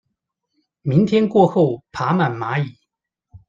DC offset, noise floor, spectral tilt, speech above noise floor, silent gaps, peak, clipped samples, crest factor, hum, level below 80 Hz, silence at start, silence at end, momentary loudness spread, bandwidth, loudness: under 0.1%; -76 dBFS; -8.5 dB/octave; 59 dB; none; -2 dBFS; under 0.1%; 18 dB; none; -58 dBFS; 0.85 s; 0.1 s; 10 LU; 7.6 kHz; -18 LUFS